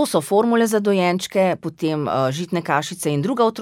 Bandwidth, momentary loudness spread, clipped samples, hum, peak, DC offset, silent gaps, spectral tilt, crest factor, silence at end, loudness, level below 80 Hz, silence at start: 17.5 kHz; 6 LU; under 0.1%; none; -2 dBFS; under 0.1%; none; -5.5 dB/octave; 16 dB; 0 s; -20 LUFS; -64 dBFS; 0 s